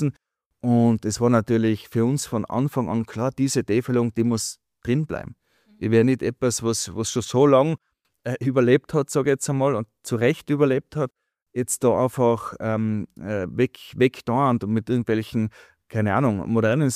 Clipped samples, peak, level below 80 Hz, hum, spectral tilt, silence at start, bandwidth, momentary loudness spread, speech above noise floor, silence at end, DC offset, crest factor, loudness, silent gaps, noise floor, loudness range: under 0.1%; -4 dBFS; -56 dBFS; none; -6 dB/octave; 0 s; 15.5 kHz; 10 LU; 45 dB; 0 s; under 0.1%; 18 dB; -23 LUFS; 0.46-0.50 s, 11.42-11.46 s; -67 dBFS; 3 LU